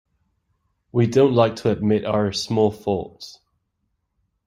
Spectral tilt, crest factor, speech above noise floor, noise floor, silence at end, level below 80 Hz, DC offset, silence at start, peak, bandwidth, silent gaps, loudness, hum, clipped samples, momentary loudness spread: -6.5 dB/octave; 20 dB; 54 dB; -74 dBFS; 1.15 s; -56 dBFS; under 0.1%; 0.95 s; -2 dBFS; 12.5 kHz; none; -20 LUFS; none; under 0.1%; 14 LU